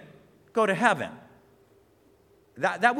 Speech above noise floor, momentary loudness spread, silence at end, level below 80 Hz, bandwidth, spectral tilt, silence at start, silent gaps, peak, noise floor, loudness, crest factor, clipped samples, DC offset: 37 dB; 10 LU; 0 s; -74 dBFS; 14 kHz; -4.5 dB/octave; 0.55 s; none; -6 dBFS; -61 dBFS; -26 LUFS; 24 dB; under 0.1%; under 0.1%